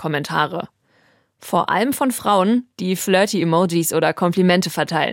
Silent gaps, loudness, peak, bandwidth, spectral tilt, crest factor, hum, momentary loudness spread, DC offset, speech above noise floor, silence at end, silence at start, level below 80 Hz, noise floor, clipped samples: none; -18 LUFS; -4 dBFS; 17 kHz; -5 dB/octave; 16 dB; none; 6 LU; under 0.1%; 40 dB; 0 s; 0 s; -64 dBFS; -59 dBFS; under 0.1%